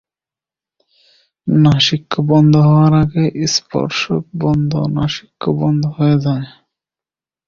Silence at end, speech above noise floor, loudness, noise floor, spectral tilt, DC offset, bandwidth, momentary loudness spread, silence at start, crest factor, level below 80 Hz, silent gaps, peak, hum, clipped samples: 1 s; over 76 dB; -14 LUFS; under -90 dBFS; -6 dB/octave; under 0.1%; 7.4 kHz; 10 LU; 1.45 s; 14 dB; -44 dBFS; none; -2 dBFS; none; under 0.1%